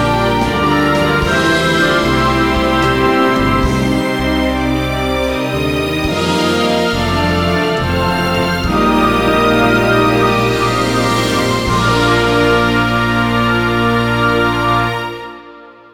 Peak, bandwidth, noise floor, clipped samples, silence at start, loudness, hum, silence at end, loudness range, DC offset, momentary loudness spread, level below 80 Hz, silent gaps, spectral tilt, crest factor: -2 dBFS; 17.5 kHz; -37 dBFS; under 0.1%; 0 s; -13 LUFS; none; 0.05 s; 2 LU; 0.8%; 4 LU; -28 dBFS; none; -5.5 dB/octave; 12 dB